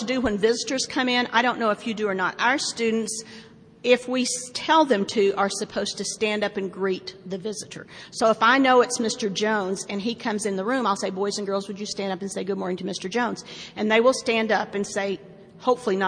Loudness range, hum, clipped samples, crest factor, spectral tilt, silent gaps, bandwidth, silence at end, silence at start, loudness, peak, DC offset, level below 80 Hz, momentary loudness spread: 4 LU; none; under 0.1%; 20 dB; -3.5 dB/octave; none; 10.5 kHz; 0 s; 0 s; -24 LUFS; -4 dBFS; under 0.1%; -60 dBFS; 12 LU